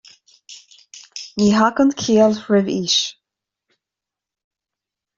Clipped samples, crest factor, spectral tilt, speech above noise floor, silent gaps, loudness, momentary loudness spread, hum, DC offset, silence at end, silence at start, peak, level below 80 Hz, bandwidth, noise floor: under 0.1%; 18 dB; -4.5 dB/octave; 71 dB; none; -17 LUFS; 14 LU; none; under 0.1%; 2.05 s; 0.5 s; -2 dBFS; -58 dBFS; 7.6 kHz; -87 dBFS